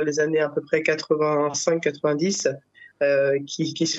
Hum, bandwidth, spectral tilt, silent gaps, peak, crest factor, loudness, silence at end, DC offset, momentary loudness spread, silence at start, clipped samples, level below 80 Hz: none; 8.4 kHz; -4 dB/octave; none; -6 dBFS; 16 dB; -23 LUFS; 0 s; under 0.1%; 4 LU; 0 s; under 0.1%; -74 dBFS